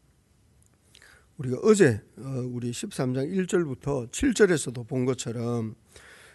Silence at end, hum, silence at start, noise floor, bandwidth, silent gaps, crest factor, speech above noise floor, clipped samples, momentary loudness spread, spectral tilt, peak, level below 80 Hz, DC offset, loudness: 0.2 s; none; 1.4 s; -63 dBFS; 12 kHz; none; 20 dB; 37 dB; under 0.1%; 13 LU; -5.5 dB/octave; -6 dBFS; -52 dBFS; under 0.1%; -26 LUFS